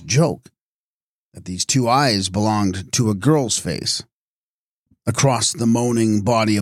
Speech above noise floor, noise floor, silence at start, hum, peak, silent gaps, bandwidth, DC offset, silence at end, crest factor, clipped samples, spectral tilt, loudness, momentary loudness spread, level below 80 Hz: over 72 dB; under -90 dBFS; 0 s; none; -4 dBFS; 0.61-1.32 s, 4.13-4.86 s; 15.5 kHz; under 0.1%; 0 s; 16 dB; under 0.1%; -4.5 dB/octave; -19 LUFS; 8 LU; -52 dBFS